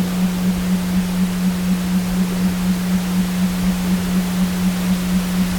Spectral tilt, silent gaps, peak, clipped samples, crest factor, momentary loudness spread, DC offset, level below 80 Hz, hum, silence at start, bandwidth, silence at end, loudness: -6 dB/octave; none; -8 dBFS; under 0.1%; 10 dB; 1 LU; under 0.1%; -34 dBFS; none; 0 s; 18 kHz; 0 s; -19 LUFS